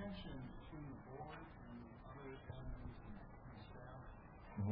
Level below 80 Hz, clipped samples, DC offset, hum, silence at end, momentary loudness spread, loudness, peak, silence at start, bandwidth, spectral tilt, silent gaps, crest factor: -60 dBFS; under 0.1%; under 0.1%; none; 0 s; 6 LU; -55 LUFS; -32 dBFS; 0 s; 5 kHz; -6.5 dB/octave; none; 18 dB